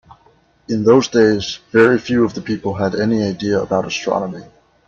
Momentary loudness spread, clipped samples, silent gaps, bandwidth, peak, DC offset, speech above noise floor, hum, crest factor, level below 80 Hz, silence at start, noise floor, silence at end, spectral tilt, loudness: 10 LU; under 0.1%; none; 7.4 kHz; 0 dBFS; under 0.1%; 38 dB; none; 16 dB; -52 dBFS; 0.1 s; -54 dBFS; 0.45 s; -5.5 dB/octave; -16 LUFS